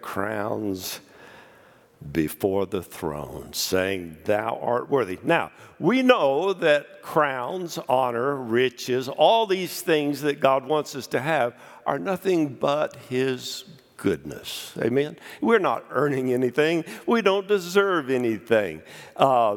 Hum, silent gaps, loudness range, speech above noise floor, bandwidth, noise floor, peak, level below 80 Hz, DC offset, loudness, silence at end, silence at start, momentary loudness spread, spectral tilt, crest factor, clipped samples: none; none; 5 LU; 30 dB; 18.5 kHz; -54 dBFS; 0 dBFS; -62 dBFS; under 0.1%; -24 LUFS; 0 s; 0 s; 10 LU; -5 dB/octave; 24 dB; under 0.1%